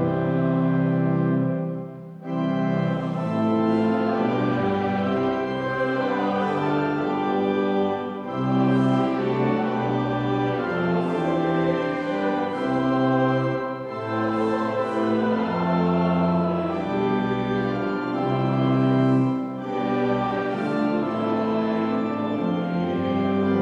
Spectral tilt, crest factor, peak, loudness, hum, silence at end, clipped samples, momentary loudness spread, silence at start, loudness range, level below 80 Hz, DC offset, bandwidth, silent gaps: -8.5 dB/octave; 12 dB; -10 dBFS; -23 LUFS; none; 0 s; under 0.1%; 5 LU; 0 s; 1 LU; -56 dBFS; under 0.1%; 8.2 kHz; none